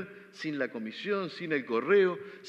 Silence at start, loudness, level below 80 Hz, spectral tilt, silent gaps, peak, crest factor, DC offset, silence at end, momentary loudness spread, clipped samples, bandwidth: 0 s; -30 LUFS; -88 dBFS; -6.5 dB/octave; none; -14 dBFS; 18 dB; under 0.1%; 0 s; 12 LU; under 0.1%; 7.8 kHz